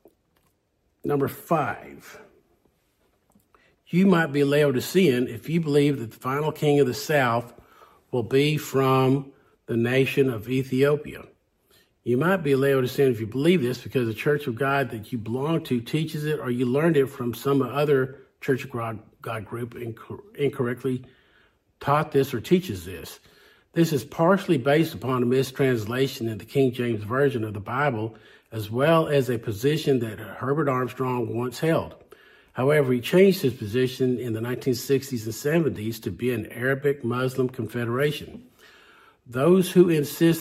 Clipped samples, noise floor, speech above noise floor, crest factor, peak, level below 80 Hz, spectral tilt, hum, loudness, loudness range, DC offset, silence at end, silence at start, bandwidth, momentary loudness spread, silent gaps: under 0.1%; -70 dBFS; 47 dB; 20 dB; -4 dBFS; -62 dBFS; -6.5 dB/octave; none; -24 LUFS; 5 LU; under 0.1%; 0 s; 1.05 s; 16 kHz; 13 LU; none